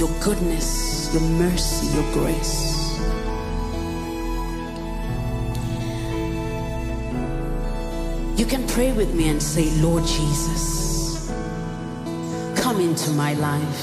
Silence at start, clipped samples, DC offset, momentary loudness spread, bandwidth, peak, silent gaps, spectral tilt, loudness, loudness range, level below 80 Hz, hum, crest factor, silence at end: 0 s; under 0.1%; under 0.1%; 8 LU; 15.5 kHz; -8 dBFS; none; -5 dB/octave; -24 LUFS; 6 LU; -28 dBFS; none; 16 dB; 0 s